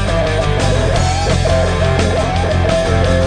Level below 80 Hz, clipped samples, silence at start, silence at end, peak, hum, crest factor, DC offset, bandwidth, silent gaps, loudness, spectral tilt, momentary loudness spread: -20 dBFS; under 0.1%; 0 s; 0 s; -2 dBFS; none; 10 dB; under 0.1%; 10 kHz; none; -15 LUFS; -5.5 dB/octave; 2 LU